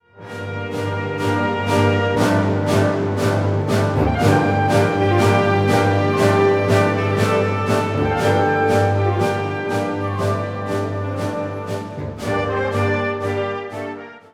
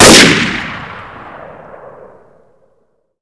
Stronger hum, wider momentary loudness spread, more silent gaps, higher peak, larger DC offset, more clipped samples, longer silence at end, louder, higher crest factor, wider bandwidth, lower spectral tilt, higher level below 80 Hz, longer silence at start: neither; second, 10 LU vs 28 LU; neither; about the same, -2 dBFS vs 0 dBFS; about the same, 0.1% vs 0.2%; second, under 0.1% vs 4%; second, 0.15 s vs 1.85 s; second, -19 LUFS vs -7 LUFS; about the same, 16 dB vs 12 dB; first, 14.5 kHz vs 11 kHz; first, -6.5 dB/octave vs -2.5 dB/octave; second, -42 dBFS vs -36 dBFS; first, 0.15 s vs 0 s